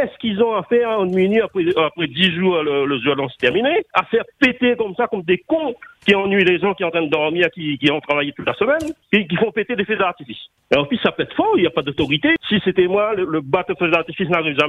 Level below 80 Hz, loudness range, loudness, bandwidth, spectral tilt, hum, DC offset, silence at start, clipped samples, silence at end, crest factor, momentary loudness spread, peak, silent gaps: -54 dBFS; 2 LU; -18 LUFS; 10 kHz; -6.5 dB/octave; none; under 0.1%; 0 s; under 0.1%; 0 s; 18 dB; 5 LU; -2 dBFS; none